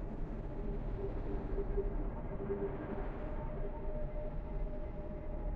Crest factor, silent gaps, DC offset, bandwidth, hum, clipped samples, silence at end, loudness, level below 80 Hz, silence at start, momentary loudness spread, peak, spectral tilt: 14 dB; none; under 0.1%; 3.8 kHz; none; under 0.1%; 0 s; -43 LUFS; -40 dBFS; 0 s; 5 LU; -24 dBFS; -10.5 dB/octave